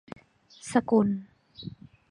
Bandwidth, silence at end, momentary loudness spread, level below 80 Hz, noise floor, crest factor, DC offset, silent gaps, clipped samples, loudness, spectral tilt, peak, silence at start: 11 kHz; 0.4 s; 23 LU; -64 dBFS; -53 dBFS; 22 dB; under 0.1%; none; under 0.1%; -26 LUFS; -6.5 dB/octave; -8 dBFS; 0.65 s